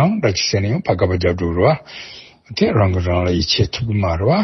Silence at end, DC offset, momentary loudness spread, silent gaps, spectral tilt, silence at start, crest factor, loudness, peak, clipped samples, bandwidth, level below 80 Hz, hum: 0 s; under 0.1%; 13 LU; none; -5.5 dB/octave; 0 s; 14 dB; -17 LUFS; -2 dBFS; under 0.1%; 6.2 kHz; -36 dBFS; none